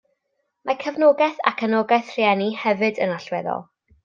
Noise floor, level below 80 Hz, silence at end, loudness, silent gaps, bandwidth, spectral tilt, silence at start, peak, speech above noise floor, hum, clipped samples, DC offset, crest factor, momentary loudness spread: -74 dBFS; -70 dBFS; 0.45 s; -21 LUFS; none; 7.2 kHz; -6 dB/octave; 0.65 s; -2 dBFS; 54 dB; none; under 0.1%; under 0.1%; 18 dB; 10 LU